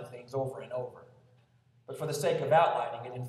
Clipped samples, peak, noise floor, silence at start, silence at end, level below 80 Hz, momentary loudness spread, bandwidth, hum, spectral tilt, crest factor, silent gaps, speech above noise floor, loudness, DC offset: under 0.1%; -12 dBFS; -65 dBFS; 0 s; 0 s; -76 dBFS; 14 LU; 14 kHz; none; -5 dB/octave; 20 dB; none; 35 dB; -31 LUFS; under 0.1%